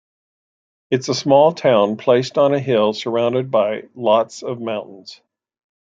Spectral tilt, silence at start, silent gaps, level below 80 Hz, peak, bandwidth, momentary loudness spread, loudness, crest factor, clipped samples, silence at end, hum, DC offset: -5.5 dB/octave; 0.9 s; none; -66 dBFS; -2 dBFS; 7.8 kHz; 12 LU; -17 LUFS; 18 dB; under 0.1%; 0.7 s; none; under 0.1%